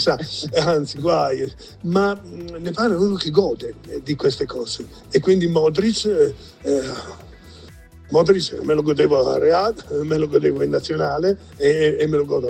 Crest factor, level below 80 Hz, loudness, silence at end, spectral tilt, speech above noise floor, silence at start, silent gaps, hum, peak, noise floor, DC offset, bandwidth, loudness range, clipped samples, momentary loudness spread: 18 dB; -46 dBFS; -20 LUFS; 0 s; -6 dB/octave; 23 dB; 0 s; none; none; -2 dBFS; -43 dBFS; under 0.1%; 9.6 kHz; 3 LU; under 0.1%; 13 LU